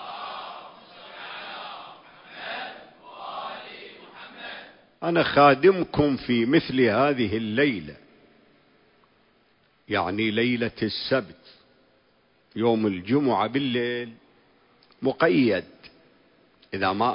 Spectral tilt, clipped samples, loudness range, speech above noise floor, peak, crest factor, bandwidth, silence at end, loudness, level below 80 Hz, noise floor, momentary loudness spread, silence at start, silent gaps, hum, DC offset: -10 dB/octave; under 0.1%; 16 LU; 41 dB; -4 dBFS; 22 dB; 5.4 kHz; 0 s; -24 LUFS; -56 dBFS; -63 dBFS; 22 LU; 0 s; none; none; under 0.1%